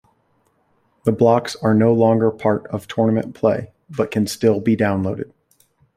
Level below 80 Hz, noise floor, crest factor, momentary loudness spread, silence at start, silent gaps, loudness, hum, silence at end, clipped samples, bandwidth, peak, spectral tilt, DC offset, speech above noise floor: -58 dBFS; -63 dBFS; 16 dB; 11 LU; 1.05 s; none; -18 LUFS; none; 0.7 s; under 0.1%; 15 kHz; -2 dBFS; -7 dB/octave; under 0.1%; 46 dB